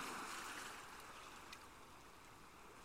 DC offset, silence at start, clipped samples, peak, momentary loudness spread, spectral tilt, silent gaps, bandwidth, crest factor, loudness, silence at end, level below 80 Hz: under 0.1%; 0 s; under 0.1%; -36 dBFS; 12 LU; -1.5 dB/octave; none; 16 kHz; 18 dB; -53 LUFS; 0 s; -72 dBFS